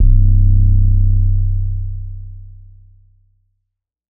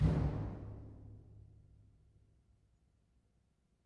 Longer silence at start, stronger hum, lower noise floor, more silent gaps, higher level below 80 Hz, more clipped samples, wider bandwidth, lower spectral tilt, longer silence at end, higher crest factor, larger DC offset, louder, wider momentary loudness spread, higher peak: about the same, 0 s vs 0 s; neither; about the same, -75 dBFS vs -76 dBFS; neither; first, -16 dBFS vs -48 dBFS; neither; second, 0.4 kHz vs 7 kHz; first, -24 dB/octave vs -9.5 dB/octave; second, 1.7 s vs 2.45 s; second, 12 dB vs 22 dB; neither; first, -16 LUFS vs -40 LUFS; second, 20 LU vs 25 LU; first, -2 dBFS vs -20 dBFS